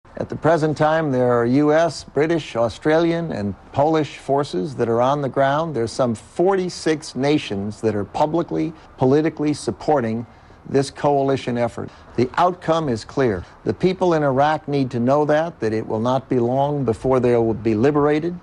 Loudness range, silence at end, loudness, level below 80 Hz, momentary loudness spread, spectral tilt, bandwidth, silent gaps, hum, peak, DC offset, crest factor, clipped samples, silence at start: 2 LU; 0.05 s; -20 LUFS; -48 dBFS; 7 LU; -6.5 dB/octave; 11.5 kHz; none; none; -6 dBFS; under 0.1%; 14 dB; under 0.1%; 0.15 s